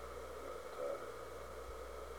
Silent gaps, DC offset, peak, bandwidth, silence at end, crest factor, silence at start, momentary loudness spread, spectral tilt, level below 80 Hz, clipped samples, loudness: none; 0.1%; -32 dBFS; over 20 kHz; 0 s; 16 dB; 0 s; 5 LU; -4.5 dB/octave; -58 dBFS; under 0.1%; -48 LUFS